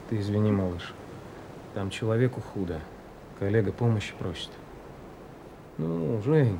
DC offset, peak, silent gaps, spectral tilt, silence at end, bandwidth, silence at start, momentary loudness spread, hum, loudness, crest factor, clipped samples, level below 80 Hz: under 0.1%; -12 dBFS; none; -7.5 dB/octave; 0 s; 11.5 kHz; 0 s; 20 LU; none; -29 LUFS; 18 dB; under 0.1%; -56 dBFS